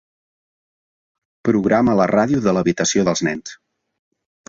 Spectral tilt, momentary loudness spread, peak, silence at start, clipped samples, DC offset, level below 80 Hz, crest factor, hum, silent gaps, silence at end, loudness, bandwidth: -5 dB/octave; 9 LU; -2 dBFS; 1.45 s; under 0.1%; under 0.1%; -52 dBFS; 18 dB; none; none; 0.95 s; -17 LUFS; 7.8 kHz